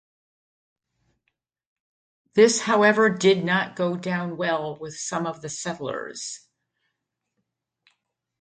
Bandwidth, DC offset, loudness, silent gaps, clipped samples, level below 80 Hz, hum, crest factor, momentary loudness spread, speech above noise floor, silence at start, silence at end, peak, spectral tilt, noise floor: 9.4 kHz; under 0.1%; -23 LUFS; none; under 0.1%; -70 dBFS; none; 22 dB; 15 LU; 58 dB; 2.35 s; 2.05 s; -4 dBFS; -4 dB/octave; -81 dBFS